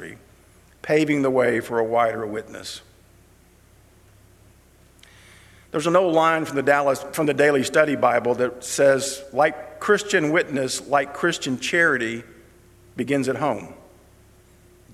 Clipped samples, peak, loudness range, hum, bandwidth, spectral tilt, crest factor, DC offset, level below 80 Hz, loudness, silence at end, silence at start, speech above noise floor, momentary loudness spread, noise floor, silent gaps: under 0.1%; -2 dBFS; 8 LU; none; 15 kHz; -4 dB/octave; 20 dB; under 0.1%; -58 dBFS; -21 LUFS; 1.2 s; 0 s; 33 dB; 13 LU; -54 dBFS; none